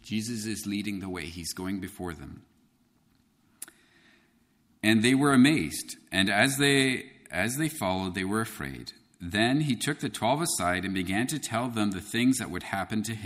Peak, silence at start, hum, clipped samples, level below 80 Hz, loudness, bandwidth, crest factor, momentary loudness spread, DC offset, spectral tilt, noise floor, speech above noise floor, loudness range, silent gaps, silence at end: -8 dBFS; 0.05 s; none; under 0.1%; -58 dBFS; -27 LUFS; 15.5 kHz; 20 dB; 16 LU; under 0.1%; -4 dB/octave; -67 dBFS; 39 dB; 13 LU; none; 0 s